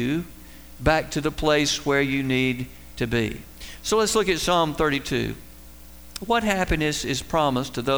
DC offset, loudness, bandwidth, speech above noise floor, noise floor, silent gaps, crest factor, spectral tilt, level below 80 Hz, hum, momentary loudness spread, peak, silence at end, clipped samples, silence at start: 0.4%; -23 LUFS; over 20 kHz; 22 dB; -45 dBFS; none; 18 dB; -4 dB/octave; -40 dBFS; none; 12 LU; -6 dBFS; 0 s; under 0.1%; 0 s